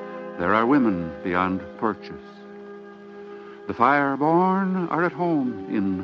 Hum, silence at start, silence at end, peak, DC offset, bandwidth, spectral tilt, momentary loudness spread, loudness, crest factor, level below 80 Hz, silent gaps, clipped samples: none; 0 s; 0 s; -4 dBFS; under 0.1%; 6.4 kHz; -9 dB/octave; 22 LU; -22 LUFS; 20 dB; -60 dBFS; none; under 0.1%